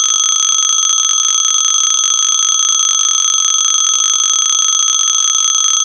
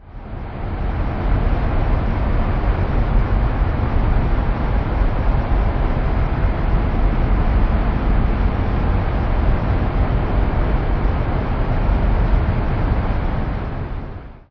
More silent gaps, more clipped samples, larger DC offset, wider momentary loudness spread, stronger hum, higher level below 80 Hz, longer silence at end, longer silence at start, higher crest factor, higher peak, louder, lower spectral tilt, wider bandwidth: neither; neither; neither; second, 0 LU vs 5 LU; neither; second, -58 dBFS vs -18 dBFS; about the same, 0 s vs 0.1 s; about the same, 0 s vs 0.05 s; about the same, 12 dB vs 12 dB; first, 0 dBFS vs -4 dBFS; first, -9 LUFS vs -21 LUFS; second, 6 dB/octave vs -10 dB/octave; first, 14.5 kHz vs 5.4 kHz